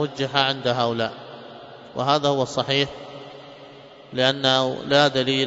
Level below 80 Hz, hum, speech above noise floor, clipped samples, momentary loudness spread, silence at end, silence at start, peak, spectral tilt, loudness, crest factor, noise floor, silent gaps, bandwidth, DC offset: -62 dBFS; none; 23 dB; under 0.1%; 22 LU; 0 s; 0 s; -4 dBFS; -4.5 dB/octave; -21 LUFS; 20 dB; -44 dBFS; none; 8 kHz; under 0.1%